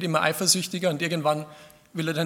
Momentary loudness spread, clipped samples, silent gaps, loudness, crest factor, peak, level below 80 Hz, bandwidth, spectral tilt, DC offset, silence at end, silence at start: 12 LU; under 0.1%; none; -24 LUFS; 20 dB; -4 dBFS; -70 dBFS; 18 kHz; -3.5 dB/octave; under 0.1%; 0 s; 0 s